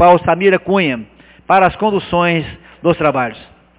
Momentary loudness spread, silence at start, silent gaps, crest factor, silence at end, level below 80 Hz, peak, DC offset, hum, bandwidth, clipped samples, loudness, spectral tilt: 8 LU; 0 s; none; 14 dB; 0.35 s; -42 dBFS; 0 dBFS; under 0.1%; none; 4 kHz; under 0.1%; -14 LUFS; -10 dB/octave